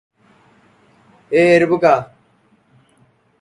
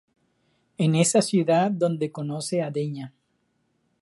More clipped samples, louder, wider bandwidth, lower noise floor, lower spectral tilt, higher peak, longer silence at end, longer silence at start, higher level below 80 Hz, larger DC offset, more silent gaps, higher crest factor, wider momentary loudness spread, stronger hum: neither; first, -14 LUFS vs -24 LUFS; about the same, 11 kHz vs 11.5 kHz; second, -57 dBFS vs -71 dBFS; about the same, -6.5 dB/octave vs -5.5 dB/octave; first, 0 dBFS vs -6 dBFS; first, 1.35 s vs 0.9 s; first, 1.3 s vs 0.8 s; first, -60 dBFS vs -72 dBFS; neither; neither; about the same, 18 dB vs 20 dB; second, 7 LU vs 11 LU; neither